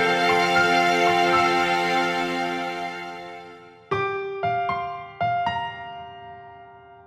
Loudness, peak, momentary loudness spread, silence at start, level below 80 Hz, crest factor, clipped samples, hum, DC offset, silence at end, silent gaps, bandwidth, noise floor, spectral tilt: -22 LUFS; -8 dBFS; 20 LU; 0 s; -60 dBFS; 16 dB; under 0.1%; none; under 0.1%; 0.05 s; none; 15.5 kHz; -46 dBFS; -4 dB/octave